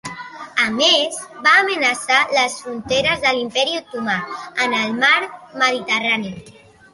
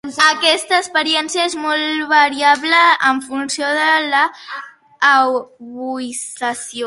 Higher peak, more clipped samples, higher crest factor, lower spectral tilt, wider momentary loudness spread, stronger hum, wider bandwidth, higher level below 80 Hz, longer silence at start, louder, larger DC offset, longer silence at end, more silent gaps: about the same, -2 dBFS vs 0 dBFS; neither; about the same, 18 dB vs 16 dB; first, -2 dB/octave vs -0.5 dB/octave; about the same, 12 LU vs 13 LU; neither; about the same, 11.5 kHz vs 11.5 kHz; first, -56 dBFS vs -66 dBFS; about the same, 0.05 s vs 0.05 s; about the same, -17 LUFS vs -15 LUFS; neither; first, 0.4 s vs 0 s; neither